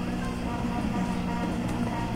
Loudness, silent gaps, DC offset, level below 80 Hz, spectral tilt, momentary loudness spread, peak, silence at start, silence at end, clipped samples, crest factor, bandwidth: -30 LUFS; none; under 0.1%; -40 dBFS; -6.5 dB/octave; 2 LU; -18 dBFS; 0 s; 0 s; under 0.1%; 12 dB; 16 kHz